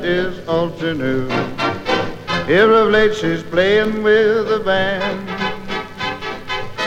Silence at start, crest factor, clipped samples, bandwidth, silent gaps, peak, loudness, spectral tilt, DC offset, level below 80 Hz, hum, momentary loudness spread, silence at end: 0 s; 16 dB; under 0.1%; 9.2 kHz; none; 0 dBFS; -17 LUFS; -5.5 dB/octave; under 0.1%; -40 dBFS; none; 12 LU; 0 s